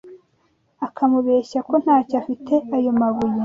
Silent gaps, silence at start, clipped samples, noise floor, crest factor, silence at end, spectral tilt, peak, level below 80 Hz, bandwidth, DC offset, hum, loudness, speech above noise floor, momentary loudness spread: none; 0.05 s; under 0.1%; -64 dBFS; 14 dB; 0 s; -8 dB/octave; -6 dBFS; -60 dBFS; 7.4 kHz; under 0.1%; none; -19 LUFS; 45 dB; 7 LU